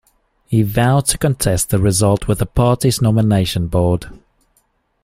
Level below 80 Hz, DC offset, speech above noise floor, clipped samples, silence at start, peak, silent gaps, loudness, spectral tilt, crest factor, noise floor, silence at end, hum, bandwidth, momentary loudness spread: -34 dBFS; under 0.1%; 47 dB; under 0.1%; 0.5 s; 0 dBFS; none; -16 LUFS; -5.5 dB/octave; 16 dB; -62 dBFS; 0.85 s; none; 16 kHz; 4 LU